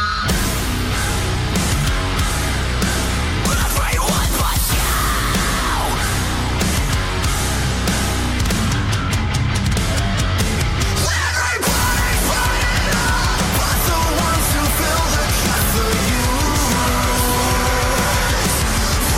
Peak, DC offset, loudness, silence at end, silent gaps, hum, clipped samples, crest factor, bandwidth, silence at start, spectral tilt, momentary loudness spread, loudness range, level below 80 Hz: -4 dBFS; under 0.1%; -18 LUFS; 0 s; none; none; under 0.1%; 12 dB; 17 kHz; 0 s; -3.5 dB/octave; 3 LU; 2 LU; -22 dBFS